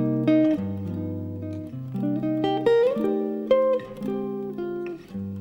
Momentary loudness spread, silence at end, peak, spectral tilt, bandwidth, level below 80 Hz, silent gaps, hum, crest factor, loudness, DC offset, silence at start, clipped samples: 13 LU; 0 s; -8 dBFS; -8.5 dB/octave; 16.5 kHz; -60 dBFS; none; none; 16 dB; -25 LUFS; under 0.1%; 0 s; under 0.1%